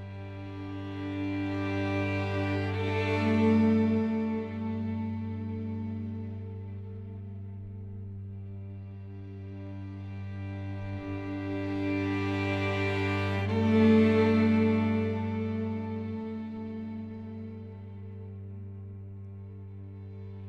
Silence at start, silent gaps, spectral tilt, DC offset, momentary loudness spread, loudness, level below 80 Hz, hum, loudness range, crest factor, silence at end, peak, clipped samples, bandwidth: 0 s; none; -8.5 dB/octave; under 0.1%; 19 LU; -30 LUFS; -62 dBFS; none; 16 LU; 18 dB; 0 s; -12 dBFS; under 0.1%; 7.8 kHz